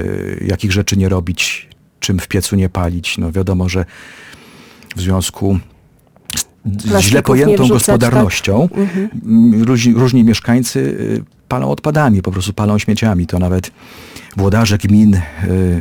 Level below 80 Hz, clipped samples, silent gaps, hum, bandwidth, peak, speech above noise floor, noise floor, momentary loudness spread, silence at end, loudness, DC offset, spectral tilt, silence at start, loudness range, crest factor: -36 dBFS; under 0.1%; none; none; 19 kHz; -2 dBFS; 35 dB; -48 dBFS; 11 LU; 0 s; -14 LUFS; under 0.1%; -5.5 dB/octave; 0 s; 7 LU; 12 dB